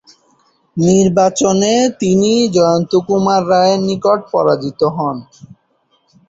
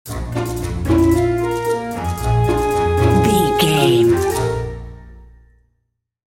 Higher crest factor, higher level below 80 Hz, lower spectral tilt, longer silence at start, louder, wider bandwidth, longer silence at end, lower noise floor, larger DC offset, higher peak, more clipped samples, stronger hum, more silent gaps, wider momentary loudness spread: about the same, 14 dB vs 16 dB; second, -52 dBFS vs -30 dBFS; about the same, -5.5 dB/octave vs -6 dB/octave; first, 0.75 s vs 0.05 s; first, -13 LUFS vs -17 LUFS; second, 8 kHz vs 17 kHz; about the same, 1.05 s vs 1.1 s; second, -60 dBFS vs -70 dBFS; neither; about the same, 0 dBFS vs -2 dBFS; neither; neither; neither; second, 5 LU vs 10 LU